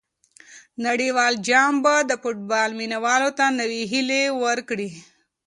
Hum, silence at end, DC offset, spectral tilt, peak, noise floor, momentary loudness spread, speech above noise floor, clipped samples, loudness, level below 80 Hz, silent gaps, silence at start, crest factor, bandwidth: none; 0.45 s; under 0.1%; -2.5 dB/octave; -4 dBFS; -52 dBFS; 10 LU; 31 dB; under 0.1%; -21 LUFS; -72 dBFS; none; 0.5 s; 18 dB; 11.5 kHz